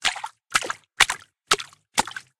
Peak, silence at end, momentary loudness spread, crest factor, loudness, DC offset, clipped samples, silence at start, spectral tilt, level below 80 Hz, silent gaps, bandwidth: 0 dBFS; 0.2 s; 12 LU; 26 dB; -24 LUFS; under 0.1%; under 0.1%; 0 s; 0.5 dB/octave; -56 dBFS; none; 17 kHz